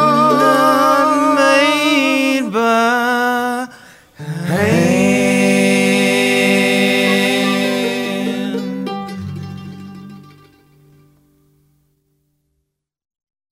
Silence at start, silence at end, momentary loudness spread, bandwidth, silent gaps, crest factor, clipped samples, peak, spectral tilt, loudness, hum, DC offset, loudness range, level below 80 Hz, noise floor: 0 s; 3.35 s; 16 LU; 16 kHz; none; 14 dB; under 0.1%; -2 dBFS; -4.5 dB/octave; -14 LUFS; none; under 0.1%; 15 LU; -60 dBFS; -72 dBFS